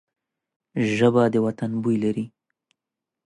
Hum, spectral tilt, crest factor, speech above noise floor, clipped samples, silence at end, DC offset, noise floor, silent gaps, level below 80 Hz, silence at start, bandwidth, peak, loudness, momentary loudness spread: none; -7.5 dB/octave; 18 dB; 65 dB; under 0.1%; 1 s; under 0.1%; -86 dBFS; none; -64 dBFS; 0.75 s; 10.5 kHz; -6 dBFS; -22 LUFS; 13 LU